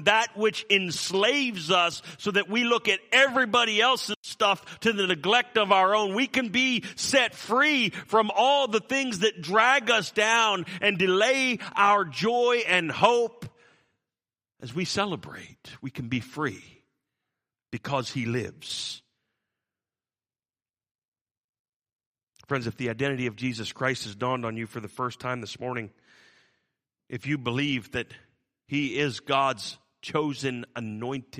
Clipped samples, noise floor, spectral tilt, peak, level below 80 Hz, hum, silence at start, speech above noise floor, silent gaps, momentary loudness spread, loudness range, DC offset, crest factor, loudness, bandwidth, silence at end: under 0.1%; under -90 dBFS; -3.5 dB/octave; -4 dBFS; -68 dBFS; none; 0 s; over 64 dB; 4.16-4.23 s, 20.91-21.02 s, 21.08-21.12 s, 21.21-21.25 s, 21.37-21.65 s, 21.76-21.80 s, 21.95-21.99 s, 22.06-22.14 s; 14 LU; 12 LU; under 0.1%; 24 dB; -25 LUFS; 15 kHz; 0 s